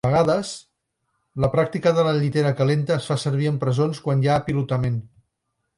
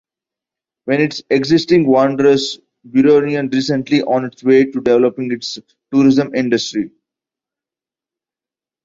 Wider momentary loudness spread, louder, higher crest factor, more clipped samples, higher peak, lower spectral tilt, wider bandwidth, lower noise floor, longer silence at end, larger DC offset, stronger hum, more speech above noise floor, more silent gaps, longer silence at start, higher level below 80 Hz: second, 6 LU vs 11 LU; second, -22 LUFS vs -15 LUFS; about the same, 16 dB vs 14 dB; neither; second, -6 dBFS vs -2 dBFS; about the same, -7 dB/octave vs -6 dB/octave; first, 11.5 kHz vs 7.8 kHz; second, -77 dBFS vs -90 dBFS; second, 0.7 s vs 1.95 s; neither; neither; second, 56 dB vs 76 dB; neither; second, 0.05 s vs 0.85 s; first, -50 dBFS vs -56 dBFS